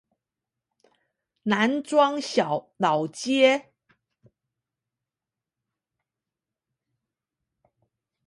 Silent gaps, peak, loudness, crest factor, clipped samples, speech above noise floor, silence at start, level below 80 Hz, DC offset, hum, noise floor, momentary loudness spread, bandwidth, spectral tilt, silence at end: none; -6 dBFS; -23 LUFS; 22 dB; under 0.1%; 66 dB; 1.45 s; -78 dBFS; under 0.1%; none; -89 dBFS; 8 LU; 11.5 kHz; -4.5 dB/octave; 4.65 s